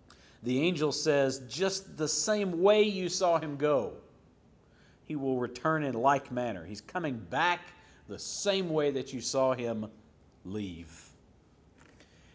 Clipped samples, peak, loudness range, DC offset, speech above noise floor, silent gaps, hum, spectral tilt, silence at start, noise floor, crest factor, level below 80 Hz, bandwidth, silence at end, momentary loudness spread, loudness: under 0.1%; -12 dBFS; 5 LU; under 0.1%; 31 dB; none; none; -4 dB/octave; 0.4 s; -62 dBFS; 20 dB; -64 dBFS; 8 kHz; 1.3 s; 14 LU; -31 LUFS